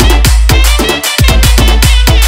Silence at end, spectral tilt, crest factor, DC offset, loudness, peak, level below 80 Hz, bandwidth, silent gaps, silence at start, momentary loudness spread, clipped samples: 0 s; -3.5 dB/octave; 6 dB; under 0.1%; -8 LUFS; 0 dBFS; -8 dBFS; 16.5 kHz; none; 0 s; 2 LU; 0.9%